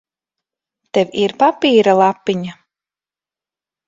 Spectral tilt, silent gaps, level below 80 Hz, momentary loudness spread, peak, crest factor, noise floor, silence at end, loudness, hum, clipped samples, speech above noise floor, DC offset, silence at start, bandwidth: -5.5 dB/octave; none; -62 dBFS; 10 LU; 0 dBFS; 18 dB; under -90 dBFS; 1.35 s; -15 LUFS; none; under 0.1%; over 76 dB; under 0.1%; 0.95 s; 7.8 kHz